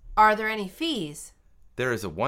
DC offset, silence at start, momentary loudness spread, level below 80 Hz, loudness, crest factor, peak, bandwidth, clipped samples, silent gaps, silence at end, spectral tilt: under 0.1%; 0.05 s; 22 LU; -50 dBFS; -25 LUFS; 20 dB; -6 dBFS; 16.5 kHz; under 0.1%; none; 0 s; -4 dB/octave